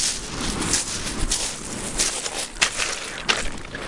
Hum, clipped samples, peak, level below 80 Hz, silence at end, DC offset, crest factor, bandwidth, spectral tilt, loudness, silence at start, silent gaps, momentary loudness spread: none; under 0.1%; -2 dBFS; -36 dBFS; 0 s; under 0.1%; 24 dB; 11.5 kHz; -1 dB/octave; -24 LUFS; 0 s; none; 6 LU